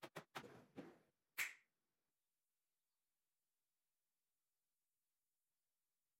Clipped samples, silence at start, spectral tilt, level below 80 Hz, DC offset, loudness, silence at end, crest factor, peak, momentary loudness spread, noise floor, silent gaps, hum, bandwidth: under 0.1%; 0 s; -2 dB/octave; under -90 dBFS; under 0.1%; -52 LUFS; 4.6 s; 32 dB; -30 dBFS; 16 LU; under -90 dBFS; none; none; 15.5 kHz